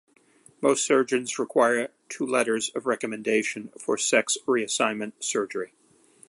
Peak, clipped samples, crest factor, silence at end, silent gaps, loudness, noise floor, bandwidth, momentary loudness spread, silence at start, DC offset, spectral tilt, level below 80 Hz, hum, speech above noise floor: -6 dBFS; under 0.1%; 20 dB; 0.65 s; none; -25 LUFS; -57 dBFS; 11.5 kHz; 10 LU; 0.6 s; under 0.1%; -2.5 dB/octave; -78 dBFS; none; 32 dB